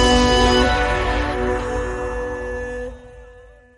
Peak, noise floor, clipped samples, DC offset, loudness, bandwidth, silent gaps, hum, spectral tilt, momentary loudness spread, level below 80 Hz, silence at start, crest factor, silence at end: -4 dBFS; -45 dBFS; under 0.1%; under 0.1%; -19 LUFS; 11.5 kHz; none; none; -4.5 dB/octave; 14 LU; -26 dBFS; 0 s; 16 dB; 0.35 s